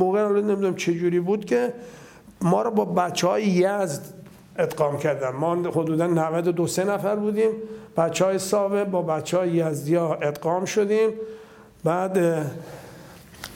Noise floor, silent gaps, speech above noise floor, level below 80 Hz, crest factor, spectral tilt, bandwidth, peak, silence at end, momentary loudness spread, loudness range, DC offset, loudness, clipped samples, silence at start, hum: -45 dBFS; none; 22 dB; -64 dBFS; 16 dB; -6 dB/octave; 17 kHz; -6 dBFS; 0 s; 13 LU; 1 LU; under 0.1%; -23 LUFS; under 0.1%; 0 s; none